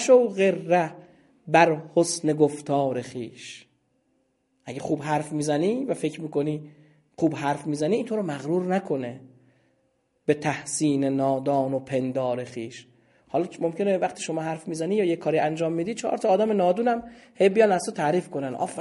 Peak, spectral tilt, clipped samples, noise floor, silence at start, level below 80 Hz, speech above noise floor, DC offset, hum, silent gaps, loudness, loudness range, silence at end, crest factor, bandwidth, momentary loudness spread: -4 dBFS; -5.5 dB/octave; under 0.1%; -70 dBFS; 0 s; -70 dBFS; 46 dB; under 0.1%; none; none; -25 LUFS; 5 LU; 0 s; 22 dB; 11.5 kHz; 11 LU